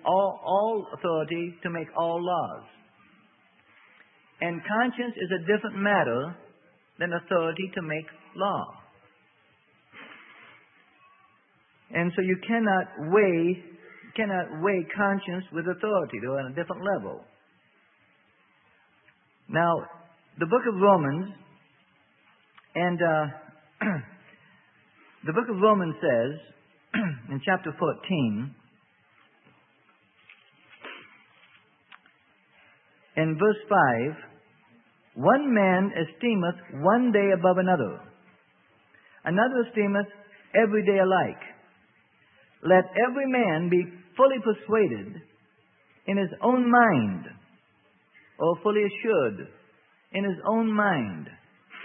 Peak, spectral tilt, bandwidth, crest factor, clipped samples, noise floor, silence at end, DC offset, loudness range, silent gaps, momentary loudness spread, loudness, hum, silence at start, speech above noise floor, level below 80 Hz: -6 dBFS; -10.5 dB/octave; 3.9 kHz; 22 dB; under 0.1%; -64 dBFS; 0 s; under 0.1%; 9 LU; none; 16 LU; -26 LUFS; none; 0.05 s; 39 dB; -74 dBFS